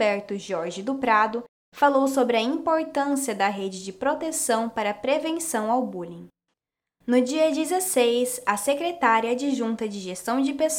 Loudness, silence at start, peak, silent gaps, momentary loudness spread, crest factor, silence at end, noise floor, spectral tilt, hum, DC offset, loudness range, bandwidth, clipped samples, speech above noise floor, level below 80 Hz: -24 LUFS; 0 s; -6 dBFS; 1.49-1.72 s; 10 LU; 18 dB; 0 s; -83 dBFS; -3 dB/octave; none; under 0.1%; 3 LU; 19 kHz; under 0.1%; 59 dB; -66 dBFS